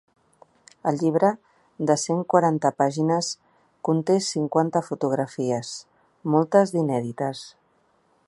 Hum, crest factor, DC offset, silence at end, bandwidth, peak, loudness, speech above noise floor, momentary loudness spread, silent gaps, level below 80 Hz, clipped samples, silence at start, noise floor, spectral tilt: none; 20 dB; under 0.1%; 0.8 s; 11.5 kHz; -4 dBFS; -23 LUFS; 42 dB; 13 LU; none; -72 dBFS; under 0.1%; 0.85 s; -65 dBFS; -5.5 dB/octave